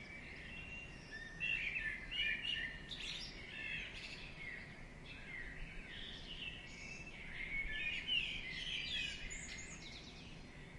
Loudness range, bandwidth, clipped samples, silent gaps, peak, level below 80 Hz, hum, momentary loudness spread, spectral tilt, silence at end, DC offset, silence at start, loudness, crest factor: 7 LU; 11.5 kHz; under 0.1%; none; -26 dBFS; -56 dBFS; none; 14 LU; -2 dB/octave; 0 s; under 0.1%; 0 s; -43 LUFS; 20 dB